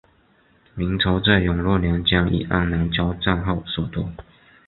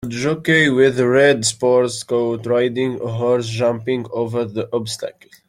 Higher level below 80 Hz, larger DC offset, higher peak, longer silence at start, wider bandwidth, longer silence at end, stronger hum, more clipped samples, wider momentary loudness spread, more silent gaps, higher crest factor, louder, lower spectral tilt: first, -34 dBFS vs -56 dBFS; neither; about the same, -2 dBFS vs -2 dBFS; first, 0.75 s vs 0 s; second, 4.3 kHz vs 15 kHz; about the same, 0.45 s vs 0.35 s; neither; neither; about the same, 10 LU vs 10 LU; neither; about the same, 20 dB vs 16 dB; second, -21 LUFS vs -18 LUFS; first, -11 dB/octave vs -4.5 dB/octave